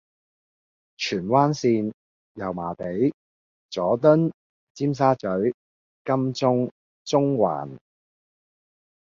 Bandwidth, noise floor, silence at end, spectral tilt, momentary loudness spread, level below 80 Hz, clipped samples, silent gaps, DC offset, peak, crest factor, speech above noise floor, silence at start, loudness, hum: 7.6 kHz; under -90 dBFS; 1.4 s; -7 dB/octave; 13 LU; -62 dBFS; under 0.1%; 1.94-2.35 s, 3.14-3.69 s, 4.34-4.75 s, 5.54-6.05 s, 6.71-7.05 s; under 0.1%; -4 dBFS; 20 dB; over 68 dB; 1 s; -23 LUFS; none